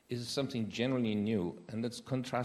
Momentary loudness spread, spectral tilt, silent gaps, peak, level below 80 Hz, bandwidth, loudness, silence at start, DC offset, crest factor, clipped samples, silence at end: 7 LU; -6 dB/octave; none; -18 dBFS; -72 dBFS; 13.5 kHz; -36 LUFS; 0.1 s; under 0.1%; 16 dB; under 0.1%; 0 s